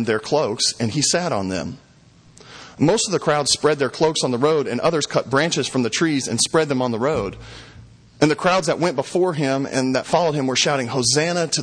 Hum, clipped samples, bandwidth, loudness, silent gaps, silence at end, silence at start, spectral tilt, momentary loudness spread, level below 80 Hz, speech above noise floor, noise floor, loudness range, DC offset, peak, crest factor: none; under 0.1%; 10.5 kHz; -19 LUFS; none; 0 s; 0 s; -3.5 dB/octave; 6 LU; -52 dBFS; 31 dB; -50 dBFS; 2 LU; under 0.1%; -2 dBFS; 18 dB